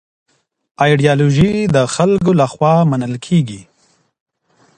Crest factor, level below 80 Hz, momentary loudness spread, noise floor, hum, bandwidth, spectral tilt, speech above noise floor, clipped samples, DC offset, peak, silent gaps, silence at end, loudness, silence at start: 14 dB; -42 dBFS; 5 LU; -58 dBFS; none; 9.6 kHz; -6.5 dB/octave; 45 dB; under 0.1%; under 0.1%; 0 dBFS; none; 1.15 s; -14 LUFS; 0.8 s